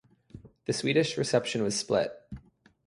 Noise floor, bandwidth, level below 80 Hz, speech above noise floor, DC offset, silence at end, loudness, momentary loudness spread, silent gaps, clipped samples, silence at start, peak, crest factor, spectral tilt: -57 dBFS; 11.5 kHz; -60 dBFS; 29 dB; under 0.1%; 0.45 s; -28 LUFS; 20 LU; none; under 0.1%; 0.35 s; -12 dBFS; 20 dB; -4 dB/octave